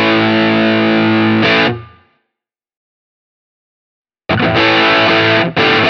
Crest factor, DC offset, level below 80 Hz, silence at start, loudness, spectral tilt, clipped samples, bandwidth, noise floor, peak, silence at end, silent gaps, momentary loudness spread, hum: 14 dB; under 0.1%; -48 dBFS; 0 s; -11 LUFS; -6 dB/octave; under 0.1%; 6.6 kHz; -80 dBFS; 0 dBFS; 0 s; 2.77-4.05 s; 7 LU; none